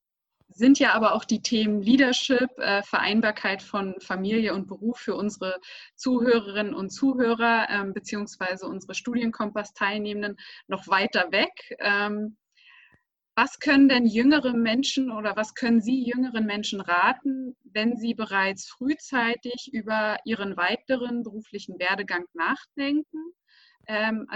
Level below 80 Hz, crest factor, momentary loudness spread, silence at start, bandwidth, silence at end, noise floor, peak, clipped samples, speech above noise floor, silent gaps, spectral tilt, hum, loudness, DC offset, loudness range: -66 dBFS; 18 dB; 12 LU; 0.6 s; 8.2 kHz; 0 s; -71 dBFS; -6 dBFS; under 0.1%; 46 dB; none; -4 dB/octave; none; -25 LUFS; under 0.1%; 6 LU